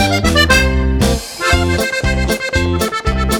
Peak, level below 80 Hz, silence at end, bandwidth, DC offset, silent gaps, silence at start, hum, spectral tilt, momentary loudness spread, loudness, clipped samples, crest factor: 0 dBFS; -20 dBFS; 0 s; 20 kHz; under 0.1%; none; 0 s; none; -4.5 dB/octave; 6 LU; -14 LUFS; under 0.1%; 14 dB